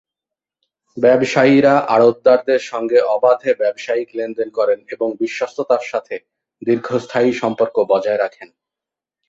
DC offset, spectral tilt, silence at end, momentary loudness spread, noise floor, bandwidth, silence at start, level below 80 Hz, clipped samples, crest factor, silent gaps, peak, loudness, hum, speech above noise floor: under 0.1%; -6 dB/octave; 0.85 s; 11 LU; -87 dBFS; 7.8 kHz; 0.95 s; -62 dBFS; under 0.1%; 16 dB; none; -2 dBFS; -16 LUFS; none; 71 dB